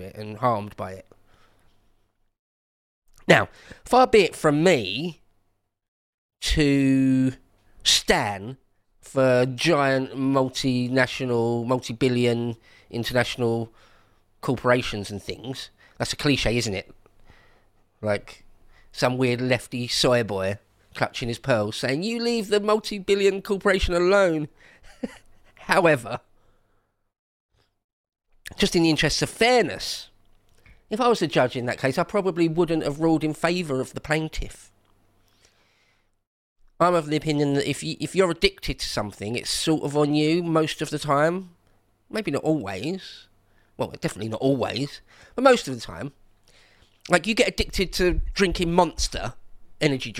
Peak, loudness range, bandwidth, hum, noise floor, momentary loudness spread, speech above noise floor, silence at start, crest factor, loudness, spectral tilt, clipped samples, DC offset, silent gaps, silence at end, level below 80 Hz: 0 dBFS; 6 LU; 16 kHz; none; -70 dBFS; 15 LU; 47 dB; 0 s; 24 dB; -23 LUFS; -4.5 dB/octave; under 0.1%; under 0.1%; 2.39-3.02 s, 5.88-6.29 s, 27.19-27.49 s, 27.84-28.04 s, 36.27-36.56 s; 0 s; -42 dBFS